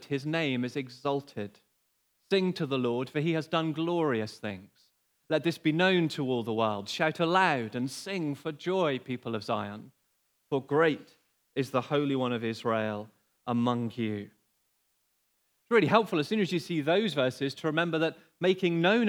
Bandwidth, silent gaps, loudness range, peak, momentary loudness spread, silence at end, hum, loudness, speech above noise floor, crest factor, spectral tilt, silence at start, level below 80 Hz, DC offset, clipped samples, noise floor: 18.5 kHz; none; 4 LU; -8 dBFS; 10 LU; 0 s; none; -29 LUFS; 45 dB; 22 dB; -6 dB/octave; 0 s; -84 dBFS; under 0.1%; under 0.1%; -74 dBFS